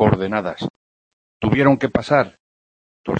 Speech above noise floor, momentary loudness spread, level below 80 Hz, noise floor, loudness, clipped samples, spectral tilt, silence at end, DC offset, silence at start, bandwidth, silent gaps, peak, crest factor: over 72 dB; 14 LU; -46 dBFS; under -90 dBFS; -19 LUFS; under 0.1%; -8 dB/octave; 0 s; under 0.1%; 0 s; 8.6 kHz; 0.70-1.40 s, 2.40-3.04 s; -2 dBFS; 18 dB